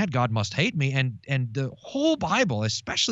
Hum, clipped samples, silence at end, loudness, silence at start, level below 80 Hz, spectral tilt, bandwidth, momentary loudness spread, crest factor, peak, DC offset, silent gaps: none; under 0.1%; 0 s; -25 LUFS; 0 s; -58 dBFS; -4.5 dB/octave; 8.2 kHz; 6 LU; 16 dB; -10 dBFS; under 0.1%; none